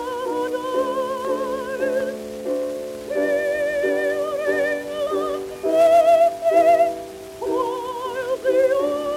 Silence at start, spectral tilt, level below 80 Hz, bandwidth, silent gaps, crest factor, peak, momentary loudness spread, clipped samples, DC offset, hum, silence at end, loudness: 0 s; -4 dB/octave; -56 dBFS; 16 kHz; none; 14 dB; -6 dBFS; 12 LU; under 0.1%; under 0.1%; none; 0 s; -21 LUFS